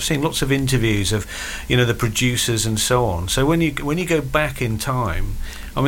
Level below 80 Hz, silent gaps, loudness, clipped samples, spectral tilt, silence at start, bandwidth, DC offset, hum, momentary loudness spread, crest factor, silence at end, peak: -30 dBFS; none; -20 LUFS; under 0.1%; -4.5 dB/octave; 0 s; 17 kHz; under 0.1%; none; 9 LU; 16 dB; 0 s; -4 dBFS